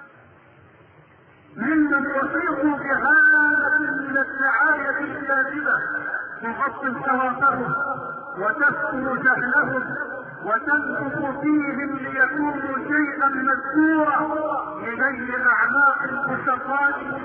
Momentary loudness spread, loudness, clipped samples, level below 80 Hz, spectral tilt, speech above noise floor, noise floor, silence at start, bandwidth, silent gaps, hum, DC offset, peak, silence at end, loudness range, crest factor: 9 LU; -21 LUFS; under 0.1%; -60 dBFS; -10 dB/octave; 30 dB; -51 dBFS; 0 s; 4.1 kHz; none; none; under 0.1%; -6 dBFS; 0 s; 4 LU; 16 dB